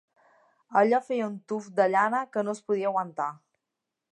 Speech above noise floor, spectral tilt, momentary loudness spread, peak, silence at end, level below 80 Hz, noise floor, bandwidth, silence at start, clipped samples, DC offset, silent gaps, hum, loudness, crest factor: 59 dB; -6 dB/octave; 10 LU; -10 dBFS; 0.8 s; -84 dBFS; -86 dBFS; 10.5 kHz; 0.7 s; under 0.1%; under 0.1%; none; none; -27 LUFS; 20 dB